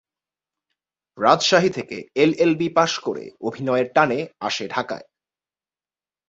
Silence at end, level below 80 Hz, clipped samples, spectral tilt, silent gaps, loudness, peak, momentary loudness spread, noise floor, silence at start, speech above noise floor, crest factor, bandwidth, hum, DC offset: 1.3 s; -64 dBFS; under 0.1%; -4.5 dB/octave; none; -21 LUFS; 0 dBFS; 12 LU; under -90 dBFS; 1.15 s; over 70 dB; 22 dB; 7.8 kHz; none; under 0.1%